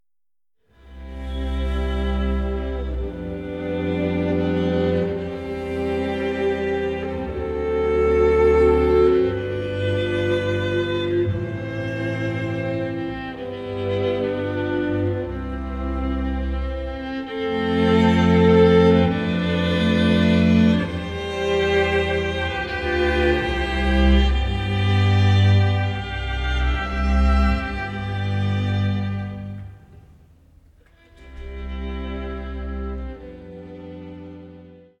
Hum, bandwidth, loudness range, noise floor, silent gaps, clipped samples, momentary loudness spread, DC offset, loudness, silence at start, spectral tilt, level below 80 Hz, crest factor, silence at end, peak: none; 9 kHz; 13 LU; under -90 dBFS; none; under 0.1%; 15 LU; under 0.1%; -21 LUFS; 0.85 s; -7.5 dB/octave; -30 dBFS; 18 dB; 0.2 s; -4 dBFS